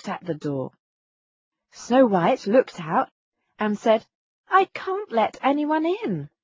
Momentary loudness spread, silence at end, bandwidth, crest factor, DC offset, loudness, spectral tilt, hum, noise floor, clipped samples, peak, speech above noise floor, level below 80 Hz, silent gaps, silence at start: 11 LU; 0.15 s; 7.6 kHz; 18 dB; under 0.1%; -23 LUFS; -6.5 dB/octave; none; under -90 dBFS; under 0.1%; -6 dBFS; over 68 dB; -70 dBFS; 0.79-1.52 s, 3.11-3.32 s, 4.15-4.44 s; 0.05 s